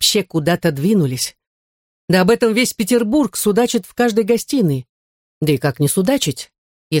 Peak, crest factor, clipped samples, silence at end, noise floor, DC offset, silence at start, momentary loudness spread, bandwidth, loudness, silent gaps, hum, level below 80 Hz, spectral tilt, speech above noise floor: -2 dBFS; 16 dB; under 0.1%; 0 s; under -90 dBFS; under 0.1%; 0 s; 8 LU; 17 kHz; -17 LUFS; 1.47-2.08 s, 4.89-5.41 s, 6.58-6.91 s; none; -52 dBFS; -4.5 dB/octave; over 74 dB